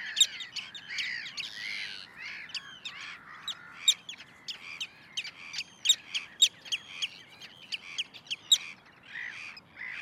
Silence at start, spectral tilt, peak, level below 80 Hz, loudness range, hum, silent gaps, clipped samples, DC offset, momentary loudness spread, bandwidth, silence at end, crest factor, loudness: 0 s; 2.5 dB/octave; -10 dBFS; -78 dBFS; 5 LU; none; none; under 0.1%; under 0.1%; 17 LU; 16 kHz; 0 s; 24 dB; -31 LUFS